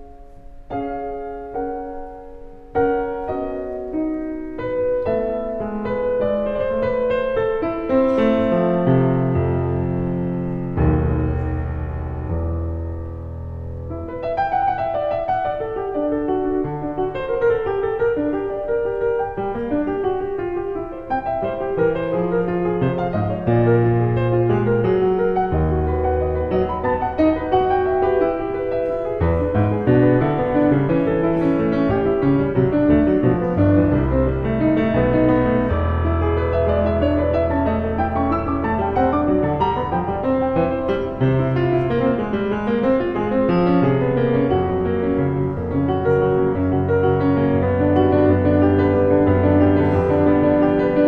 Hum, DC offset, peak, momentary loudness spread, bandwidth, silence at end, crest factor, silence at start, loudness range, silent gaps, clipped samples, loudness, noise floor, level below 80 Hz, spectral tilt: none; under 0.1%; -4 dBFS; 9 LU; 5.2 kHz; 0 s; 16 dB; 0 s; 6 LU; none; under 0.1%; -19 LUFS; -39 dBFS; -34 dBFS; -10.5 dB/octave